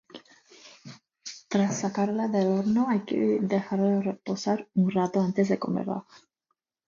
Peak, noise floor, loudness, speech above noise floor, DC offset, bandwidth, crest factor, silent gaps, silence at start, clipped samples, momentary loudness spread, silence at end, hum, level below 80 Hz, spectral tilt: -12 dBFS; -80 dBFS; -27 LUFS; 54 dB; under 0.1%; 7.4 kHz; 16 dB; none; 0.15 s; under 0.1%; 15 LU; 0.7 s; none; -70 dBFS; -6.5 dB/octave